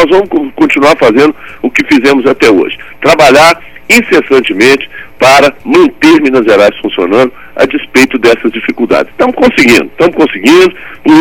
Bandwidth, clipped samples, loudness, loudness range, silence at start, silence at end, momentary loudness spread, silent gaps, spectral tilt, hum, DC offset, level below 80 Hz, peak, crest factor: 20 kHz; 6%; -7 LUFS; 2 LU; 0 s; 0 s; 8 LU; none; -4 dB/octave; none; under 0.1%; -38 dBFS; 0 dBFS; 6 dB